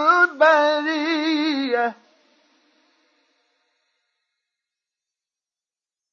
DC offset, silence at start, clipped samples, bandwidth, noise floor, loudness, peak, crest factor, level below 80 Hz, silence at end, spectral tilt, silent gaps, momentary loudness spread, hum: under 0.1%; 0 s; under 0.1%; 7.2 kHz; under -90 dBFS; -19 LUFS; -4 dBFS; 20 dB; under -90 dBFS; 4.2 s; -2.5 dB/octave; none; 8 LU; none